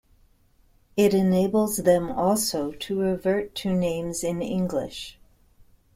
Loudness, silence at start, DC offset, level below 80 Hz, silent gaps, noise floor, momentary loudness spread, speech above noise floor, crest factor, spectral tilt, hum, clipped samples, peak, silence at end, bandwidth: -24 LUFS; 0.95 s; under 0.1%; -52 dBFS; none; -60 dBFS; 9 LU; 37 dB; 18 dB; -5.5 dB/octave; none; under 0.1%; -6 dBFS; 0.85 s; 16.5 kHz